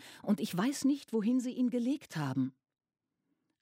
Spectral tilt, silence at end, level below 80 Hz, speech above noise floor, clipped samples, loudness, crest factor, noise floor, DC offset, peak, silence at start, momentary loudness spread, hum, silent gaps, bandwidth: -6 dB/octave; 1.1 s; -82 dBFS; 50 dB; under 0.1%; -33 LUFS; 16 dB; -83 dBFS; under 0.1%; -18 dBFS; 0 s; 5 LU; none; none; 16 kHz